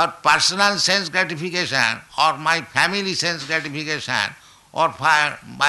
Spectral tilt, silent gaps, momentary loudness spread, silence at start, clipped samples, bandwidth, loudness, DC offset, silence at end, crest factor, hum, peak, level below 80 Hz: -2 dB/octave; none; 7 LU; 0 s; under 0.1%; 12 kHz; -19 LUFS; under 0.1%; 0 s; 18 dB; none; -4 dBFS; -60 dBFS